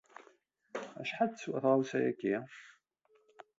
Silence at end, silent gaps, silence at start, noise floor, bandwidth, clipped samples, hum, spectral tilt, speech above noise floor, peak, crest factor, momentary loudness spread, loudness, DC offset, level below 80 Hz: 0.15 s; none; 0.2 s; -72 dBFS; 7.8 kHz; under 0.1%; none; -6 dB/octave; 39 dB; -16 dBFS; 22 dB; 16 LU; -34 LUFS; under 0.1%; -84 dBFS